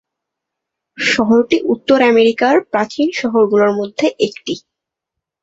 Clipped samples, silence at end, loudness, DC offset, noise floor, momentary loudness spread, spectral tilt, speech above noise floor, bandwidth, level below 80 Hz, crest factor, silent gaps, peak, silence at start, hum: under 0.1%; 0.85 s; -14 LUFS; under 0.1%; -81 dBFS; 8 LU; -4.5 dB/octave; 67 dB; 8 kHz; -58 dBFS; 14 dB; none; -2 dBFS; 1 s; none